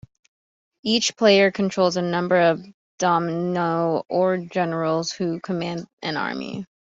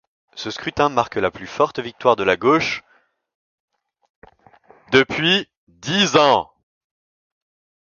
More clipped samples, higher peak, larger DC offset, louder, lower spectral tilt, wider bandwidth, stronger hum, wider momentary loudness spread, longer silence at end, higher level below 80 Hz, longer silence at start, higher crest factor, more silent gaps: neither; second, -4 dBFS vs 0 dBFS; neither; second, -22 LUFS vs -18 LUFS; about the same, -4.5 dB/octave vs -4 dB/octave; about the same, 7.8 kHz vs 7.2 kHz; neither; about the same, 13 LU vs 15 LU; second, 0.3 s vs 1.4 s; second, -64 dBFS vs -56 dBFS; first, 0.85 s vs 0.35 s; about the same, 18 dB vs 22 dB; second, 2.74-2.98 s, 5.93-5.97 s vs 3.35-3.68 s, 4.10-4.22 s, 5.57-5.67 s